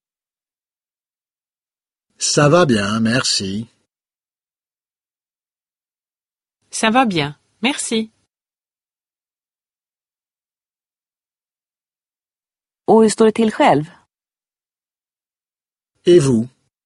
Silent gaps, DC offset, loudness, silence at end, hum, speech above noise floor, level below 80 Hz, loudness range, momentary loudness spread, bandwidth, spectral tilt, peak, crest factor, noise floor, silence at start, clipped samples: none; under 0.1%; -16 LUFS; 0.4 s; none; over 75 dB; -56 dBFS; 9 LU; 15 LU; 11.5 kHz; -4.5 dB/octave; 0 dBFS; 20 dB; under -90 dBFS; 2.2 s; under 0.1%